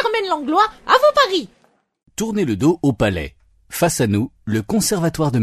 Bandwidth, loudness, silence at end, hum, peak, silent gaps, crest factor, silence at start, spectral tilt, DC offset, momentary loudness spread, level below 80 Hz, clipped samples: 13.5 kHz; -18 LUFS; 0 s; none; 0 dBFS; none; 18 dB; 0 s; -5 dB/octave; under 0.1%; 13 LU; -44 dBFS; under 0.1%